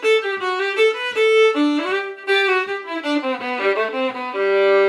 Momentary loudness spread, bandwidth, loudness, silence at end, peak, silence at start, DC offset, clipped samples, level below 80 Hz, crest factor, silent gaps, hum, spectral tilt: 8 LU; 11.5 kHz; -19 LUFS; 0 s; -6 dBFS; 0 s; under 0.1%; under 0.1%; -82 dBFS; 14 dB; none; none; -2.5 dB/octave